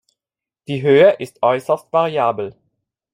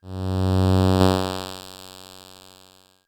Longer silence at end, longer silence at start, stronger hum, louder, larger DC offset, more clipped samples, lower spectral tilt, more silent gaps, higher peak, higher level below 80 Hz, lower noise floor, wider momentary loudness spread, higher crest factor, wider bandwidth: second, 0.6 s vs 0.8 s; first, 0.7 s vs 0.05 s; neither; first, -17 LUFS vs -21 LUFS; neither; neither; about the same, -6.5 dB/octave vs -6.5 dB/octave; neither; about the same, -2 dBFS vs 0 dBFS; second, -66 dBFS vs -50 dBFS; first, -89 dBFS vs -54 dBFS; second, 15 LU vs 23 LU; second, 16 dB vs 24 dB; second, 15 kHz vs 17.5 kHz